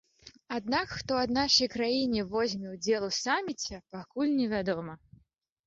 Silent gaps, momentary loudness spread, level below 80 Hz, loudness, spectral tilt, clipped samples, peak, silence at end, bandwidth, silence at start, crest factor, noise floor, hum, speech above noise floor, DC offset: none; 13 LU; -58 dBFS; -30 LUFS; -3.5 dB/octave; under 0.1%; -12 dBFS; 0.7 s; 7.8 kHz; 0.25 s; 20 dB; -68 dBFS; none; 38 dB; under 0.1%